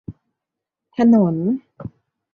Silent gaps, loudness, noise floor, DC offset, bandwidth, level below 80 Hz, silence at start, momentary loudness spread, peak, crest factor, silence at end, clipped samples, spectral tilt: none; -17 LUFS; -84 dBFS; under 0.1%; 4.8 kHz; -54 dBFS; 0.1 s; 23 LU; -4 dBFS; 16 dB; 0.45 s; under 0.1%; -10 dB/octave